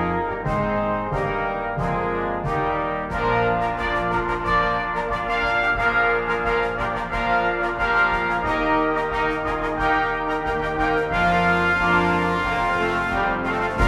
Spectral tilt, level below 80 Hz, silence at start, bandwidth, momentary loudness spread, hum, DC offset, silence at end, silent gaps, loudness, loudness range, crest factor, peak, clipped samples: -6 dB/octave; -36 dBFS; 0 s; 14 kHz; 6 LU; none; under 0.1%; 0 s; none; -22 LUFS; 3 LU; 16 dB; -6 dBFS; under 0.1%